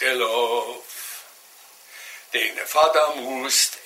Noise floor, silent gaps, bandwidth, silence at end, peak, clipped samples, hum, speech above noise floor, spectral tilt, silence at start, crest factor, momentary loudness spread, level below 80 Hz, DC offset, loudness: -49 dBFS; none; 16 kHz; 0 s; -6 dBFS; under 0.1%; none; 27 dB; 1 dB/octave; 0 s; 18 dB; 20 LU; -74 dBFS; under 0.1%; -21 LUFS